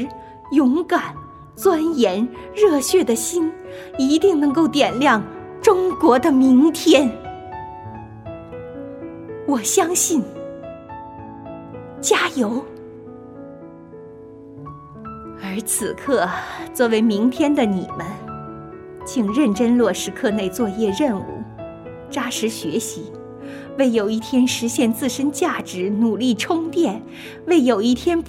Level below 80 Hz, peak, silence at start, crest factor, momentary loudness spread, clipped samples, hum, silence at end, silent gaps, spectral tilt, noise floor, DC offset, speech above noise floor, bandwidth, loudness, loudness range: -52 dBFS; 0 dBFS; 0 s; 20 dB; 20 LU; under 0.1%; none; 0 s; none; -4 dB/octave; -39 dBFS; under 0.1%; 21 dB; 16.5 kHz; -19 LUFS; 8 LU